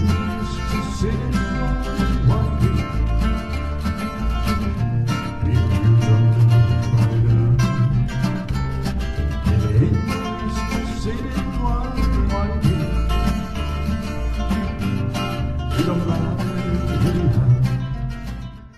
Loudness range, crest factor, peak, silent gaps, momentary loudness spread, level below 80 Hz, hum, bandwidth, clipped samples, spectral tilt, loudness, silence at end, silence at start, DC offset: 5 LU; 16 dB; -4 dBFS; none; 8 LU; -26 dBFS; none; 13 kHz; under 0.1%; -7.5 dB/octave; -21 LUFS; 0.1 s; 0 s; under 0.1%